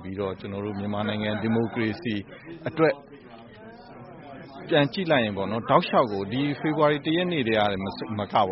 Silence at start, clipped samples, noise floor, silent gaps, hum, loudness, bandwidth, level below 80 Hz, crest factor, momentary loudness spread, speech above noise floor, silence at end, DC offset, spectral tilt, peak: 0 s; under 0.1%; -46 dBFS; none; none; -25 LUFS; 5.8 kHz; -60 dBFS; 22 dB; 21 LU; 21 dB; 0 s; under 0.1%; -4.5 dB/octave; -4 dBFS